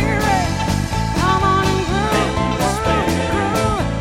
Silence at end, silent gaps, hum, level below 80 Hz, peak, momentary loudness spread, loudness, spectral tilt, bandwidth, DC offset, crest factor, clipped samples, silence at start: 0 s; none; none; -28 dBFS; -2 dBFS; 4 LU; -18 LUFS; -5 dB/octave; 16.5 kHz; under 0.1%; 14 dB; under 0.1%; 0 s